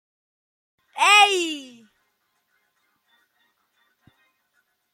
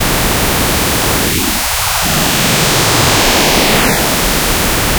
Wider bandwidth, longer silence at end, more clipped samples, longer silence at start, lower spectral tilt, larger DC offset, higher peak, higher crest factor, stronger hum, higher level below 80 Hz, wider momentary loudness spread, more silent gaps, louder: second, 16.5 kHz vs over 20 kHz; first, 3.3 s vs 0 s; neither; first, 0.95 s vs 0 s; second, 1.5 dB/octave vs -2.5 dB/octave; neither; second, -4 dBFS vs 0 dBFS; first, 24 dB vs 12 dB; neither; second, -86 dBFS vs -22 dBFS; first, 22 LU vs 3 LU; neither; second, -17 LUFS vs -10 LUFS